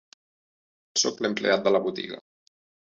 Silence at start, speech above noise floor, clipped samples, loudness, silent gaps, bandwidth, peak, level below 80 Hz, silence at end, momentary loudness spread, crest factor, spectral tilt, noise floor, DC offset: 0.95 s; over 65 dB; under 0.1%; -25 LUFS; none; 8 kHz; -8 dBFS; -72 dBFS; 0.7 s; 14 LU; 20 dB; -2.5 dB/octave; under -90 dBFS; under 0.1%